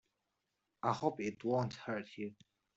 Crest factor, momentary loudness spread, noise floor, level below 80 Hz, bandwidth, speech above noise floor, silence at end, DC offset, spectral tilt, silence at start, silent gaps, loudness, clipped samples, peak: 22 dB; 11 LU; -86 dBFS; -76 dBFS; 8 kHz; 48 dB; 0.45 s; under 0.1%; -5.5 dB/octave; 0.85 s; none; -39 LUFS; under 0.1%; -18 dBFS